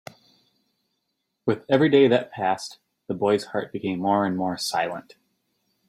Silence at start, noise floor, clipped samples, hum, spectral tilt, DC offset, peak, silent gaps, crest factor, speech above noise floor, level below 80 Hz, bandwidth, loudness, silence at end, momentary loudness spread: 1.45 s; -78 dBFS; under 0.1%; none; -5.5 dB/octave; under 0.1%; -6 dBFS; none; 20 dB; 55 dB; -68 dBFS; 14 kHz; -23 LUFS; 0.9 s; 12 LU